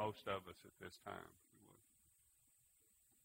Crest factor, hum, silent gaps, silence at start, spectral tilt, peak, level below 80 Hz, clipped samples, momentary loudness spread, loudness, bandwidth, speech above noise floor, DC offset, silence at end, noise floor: 24 dB; none; none; 0 s; -4.5 dB/octave; -28 dBFS; -80 dBFS; under 0.1%; 22 LU; -51 LUFS; 16 kHz; 24 dB; under 0.1%; 1.5 s; -76 dBFS